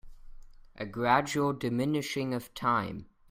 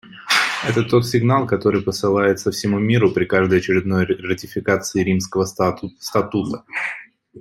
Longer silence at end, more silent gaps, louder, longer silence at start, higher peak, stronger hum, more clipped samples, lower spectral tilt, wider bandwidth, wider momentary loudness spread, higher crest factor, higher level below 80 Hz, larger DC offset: first, 0.25 s vs 0 s; neither; second, -30 LUFS vs -19 LUFS; about the same, 0.05 s vs 0.05 s; second, -10 dBFS vs -2 dBFS; neither; neither; about the same, -5.5 dB/octave vs -5.5 dB/octave; about the same, 16 kHz vs 16 kHz; first, 13 LU vs 8 LU; first, 22 dB vs 16 dB; about the same, -56 dBFS vs -54 dBFS; neither